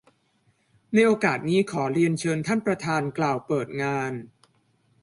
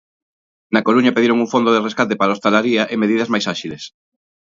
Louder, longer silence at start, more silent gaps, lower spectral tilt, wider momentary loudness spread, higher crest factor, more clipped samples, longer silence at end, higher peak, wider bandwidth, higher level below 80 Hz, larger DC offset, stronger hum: second, -24 LUFS vs -16 LUFS; first, 0.9 s vs 0.7 s; neither; about the same, -6 dB/octave vs -5 dB/octave; second, 7 LU vs 11 LU; about the same, 18 dB vs 16 dB; neither; about the same, 0.75 s vs 0.65 s; second, -8 dBFS vs 0 dBFS; first, 11.5 kHz vs 7.6 kHz; about the same, -64 dBFS vs -62 dBFS; neither; neither